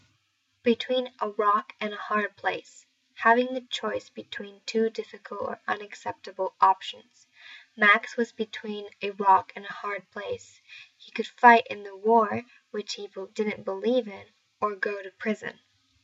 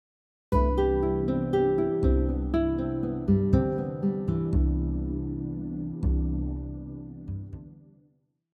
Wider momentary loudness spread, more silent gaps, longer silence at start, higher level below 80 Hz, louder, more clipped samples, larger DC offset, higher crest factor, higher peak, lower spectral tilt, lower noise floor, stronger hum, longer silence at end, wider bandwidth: first, 17 LU vs 13 LU; neither; first, 0.65 s vs 0.5 s; second, -80 dBFS vs -32 dBFS; about the same, -26 LUFS vs -27 LUFS; neither; neither; first, 24 dB vs 18 dB; first, -4 dBFS vs -8 dBFS; second, -4 dB/octave vs -10.5 dB/octave; first, -72 dBFS vs -67 dBFS; neither; second, 0.55 s vs 0.75 s; first, 8 kHz vs 4.7 kHz